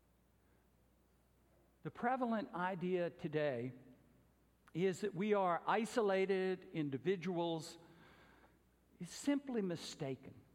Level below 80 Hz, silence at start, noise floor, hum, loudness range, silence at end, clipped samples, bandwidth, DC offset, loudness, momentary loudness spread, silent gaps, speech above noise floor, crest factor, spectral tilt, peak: -78 dBFS; 1.85 s; -73 dBFS; none; 5 LU; 0.15 s; under 0.1%; 15.5 kHz; under 0.1%; -39 LUFS; 14 LU; none; 34 dB; 20 dB; -6 dB/octave; -22 dBFS